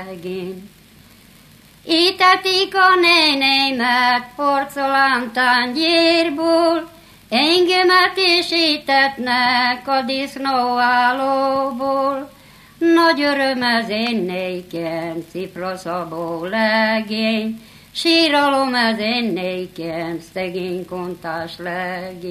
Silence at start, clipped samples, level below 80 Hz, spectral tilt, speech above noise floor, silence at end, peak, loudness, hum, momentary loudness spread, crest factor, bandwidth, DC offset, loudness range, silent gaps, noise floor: 0 s; under 0.1%; -58 dBFS; -3.5 dB/octave; 29 dB; 0 s; 0 dBFS; -17 LUFS; none; 14 LU; 18 dB; 15 kHz; under 0.1%; 7 LU; none; -47 dBFS